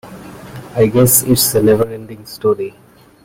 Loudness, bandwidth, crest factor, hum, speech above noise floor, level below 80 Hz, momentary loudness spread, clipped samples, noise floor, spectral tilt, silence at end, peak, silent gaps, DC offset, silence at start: -13 LUFS; 16.5 kHz; 16 dB; none; 20 dB; -42 dBFS; 23 LU; under 0.1%; -33 dBFS; -4.5 dB/octave; 0.55 s; 0 dBFS; none; under 0.1%; 0.05 s